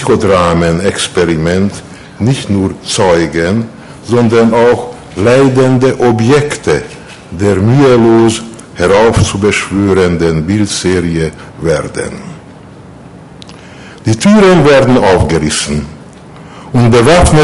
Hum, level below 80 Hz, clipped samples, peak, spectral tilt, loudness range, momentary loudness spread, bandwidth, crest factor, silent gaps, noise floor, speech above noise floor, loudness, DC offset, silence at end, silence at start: none; -28 dBFS; under 0.1%; 0 dBFS; -5.5 dB/octave; 5 LU; 13 LU; 11.5 kHz; 10 dB; none; -32 dBFS; 24 dB; -9 LUFS; under 0.1%; 0 s; 0 s